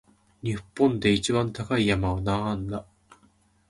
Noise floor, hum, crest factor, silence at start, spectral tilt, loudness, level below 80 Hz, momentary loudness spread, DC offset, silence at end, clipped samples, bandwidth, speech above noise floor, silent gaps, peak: -62 dBFS; none; 18 dB; 0.45 s; -5.5 dB/octave; -26 LUFS; -46 dBFS; 11 LU; under 0.1%; 0.9 s; under 0.1%; 11.5 kHz; 37 dB; none; -8 dBFS